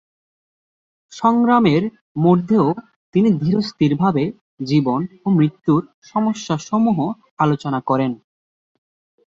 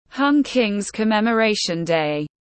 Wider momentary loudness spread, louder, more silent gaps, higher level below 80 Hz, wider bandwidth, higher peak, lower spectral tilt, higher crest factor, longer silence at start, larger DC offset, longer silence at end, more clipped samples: first, 9 LU vs 5 LU; about the same, -18 LUFS vs -20 LUFS; first, 2.01-2.15 s, 2.96-3.13 s, 4.41-4.57 s, 5.94-6.02 s, 7.31-7.37 s vs none; about the same, -58 dBFS vs -58 dBFS; second, 7.6 kHz vs 8.8 kHz; first, -2 dBFS vs -6 dBFS; first, -7.5 dB/octave vs -4.5 dB/octave; about the same, 16 dB vs 14 dB; first, 1.1 s vs 0.15 s; neither; first, 1.1 s vs 0.2 s; neither